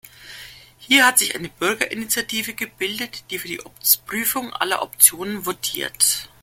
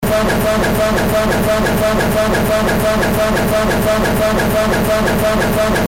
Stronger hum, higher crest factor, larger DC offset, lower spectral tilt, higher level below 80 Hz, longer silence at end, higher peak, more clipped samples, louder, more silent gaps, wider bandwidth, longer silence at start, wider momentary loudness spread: neither; first, 22 dB vs 8 dB; neither; second, -0.5 dB/octave vs -5 dB/octave; second, -58 dBFS vs -26 dBFS; first, 0.15 s vs 0 s; first, 0 dBFS vs -6 dBFS; neither; second, -19 LUFS vs -14 LUFS; neither; about the same, 17 kHz vs 17 kHz; about the same, 0.05 s vs 0 s; first, 15 LU vs 0 LU